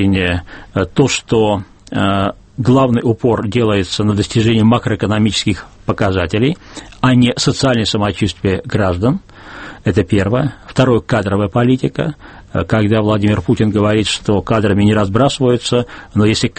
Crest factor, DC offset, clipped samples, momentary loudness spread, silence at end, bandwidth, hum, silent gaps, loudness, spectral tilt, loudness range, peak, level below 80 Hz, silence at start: 14 dB; under 0.1%; under 0.1%; 9 LU; 0.05 s; 8.8 kHz; none; none; -15 LUFS; -6 dB/octave; 2 LU; 0 dBFS; -38 dBFS; 0 s